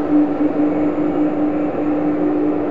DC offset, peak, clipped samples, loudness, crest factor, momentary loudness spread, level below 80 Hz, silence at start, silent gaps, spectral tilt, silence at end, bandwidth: 3%; -4 dBFS; under 0.1%; -18 LUFS; 12 dB; 2 LU; -46 dBFS; 0 s; none; -9.5 dB/octave; 0 s; 4 kHz